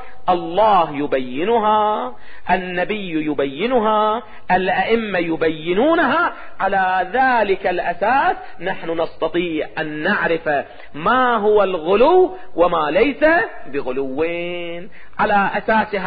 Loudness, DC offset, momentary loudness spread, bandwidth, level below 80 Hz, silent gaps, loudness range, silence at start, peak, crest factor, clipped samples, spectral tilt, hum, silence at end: -18 LUFS; under 0.1%; 10 LU; 5 kHz; -48 dBFS; none; 3 LU; 0 s; -4 dBFS; 14 dB; under 0.1%; -10.5 dB/octave; none; 0 s